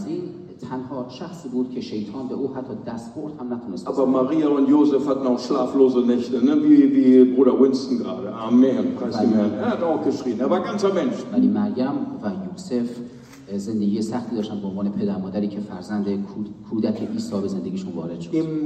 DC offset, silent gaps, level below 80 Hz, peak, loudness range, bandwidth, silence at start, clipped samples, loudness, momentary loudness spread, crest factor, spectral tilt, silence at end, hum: under 0.1%; none; -64 dBFS; -2 dBFS; 10 LU; 8.8 kHz; 0 s; under 0.1%; -21 LUFS; 15 LU; 18 dB; -7.5 dB/octave; 0 s; none